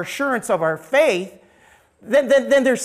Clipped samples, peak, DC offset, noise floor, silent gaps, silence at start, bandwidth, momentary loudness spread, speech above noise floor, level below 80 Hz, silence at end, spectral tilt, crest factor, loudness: under 0.1%; -6 dBFS; under 0.1%; -54 dBFS; none; 0 s; 15 kHz; 7 LU; 35 dB; -62 dBFS; 0 s; -4 dB/octave; 14 dB; -18 LUFS